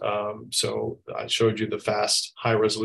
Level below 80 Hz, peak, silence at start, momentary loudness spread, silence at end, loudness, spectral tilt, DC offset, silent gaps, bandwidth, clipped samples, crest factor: -60 dBFS; -8 dBFS; 0 s; 8 LU; 0 s; -25 LUFS; -3.5 dB/octave; under 0.1%; none; 13 kHz; under 0.1%; 16 dB